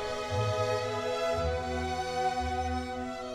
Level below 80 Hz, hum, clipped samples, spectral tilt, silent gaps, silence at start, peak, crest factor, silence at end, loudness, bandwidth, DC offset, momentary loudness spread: -46 dBFS; none; under 0.1%; -5 dB/octave; none; 0 s; -18 dBFS; 14 dB; 0 s; -32 LUFS; 15.5 kHz; under 0.1%; 4 LU